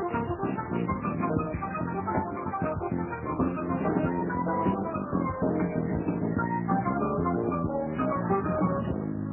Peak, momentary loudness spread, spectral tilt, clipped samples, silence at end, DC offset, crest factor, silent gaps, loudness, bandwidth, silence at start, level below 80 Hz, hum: -12 dBFS; 4 LU; -9 dB/octave; under 0.1%; 0 s; under 0.1%; 16 dB; none; -29 LUFS; 3.1 kHz; 0 s; -46 dBFS; none